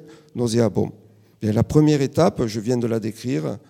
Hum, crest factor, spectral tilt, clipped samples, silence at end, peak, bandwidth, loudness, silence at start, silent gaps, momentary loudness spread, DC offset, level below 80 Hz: none; 20 dB; -7 dB/octave; under 0.1%; 0.1 s; -2 dBFS; 15.5 kHz; -21 LUFS; 0.05 s; none; 9 LU; under 0.1%; -50 dBFS